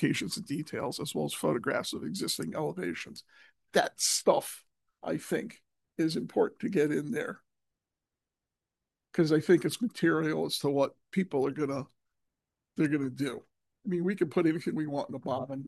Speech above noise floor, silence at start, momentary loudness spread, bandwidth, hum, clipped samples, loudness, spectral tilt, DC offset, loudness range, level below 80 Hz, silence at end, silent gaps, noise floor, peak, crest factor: 59 dB; 0 s; 14 LU; 12.5 kHz; none; under 0.1%; -31 LUFS; -4.5 dB/octave; under 0.1%; 4 LU; -76 dBFS; 0 s; none; -90 dBFS; -10 dBFS; 22 dB